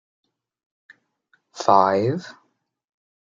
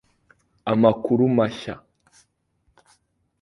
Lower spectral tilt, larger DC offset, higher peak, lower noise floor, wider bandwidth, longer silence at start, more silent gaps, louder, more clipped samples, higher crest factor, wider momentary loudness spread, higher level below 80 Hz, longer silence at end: second, -6 dB/octave vs -8 dB/octave; neither; about the same, -2 dBFS vs -2 dBFS; about the same, -66 dBFS vs -68 dBFS; second, 7.8 kHz vs 11 kHz; first, 1.55 s vs 0.65 s; neither; about the same, -20 LUFS vs -21 LUFS; neither; about the same, 22 dB vs 22 dB; about the same, 16 LU vs 17 LU; second, -74 dBFS vs -60 dBFS; second, 0.9 s vs 1.65 s